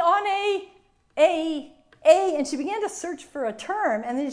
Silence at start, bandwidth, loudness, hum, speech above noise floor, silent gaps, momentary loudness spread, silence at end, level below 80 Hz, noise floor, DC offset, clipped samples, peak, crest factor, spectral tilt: 0 s; 10.5 kHz; -24 LUFS; none; 30 dB; none; 13 LU; 0 s; -66 dBFS; -58 dBFS; under 0.1%; under 0.1%; -4 dBFS; 20 dB; -3 dB/octave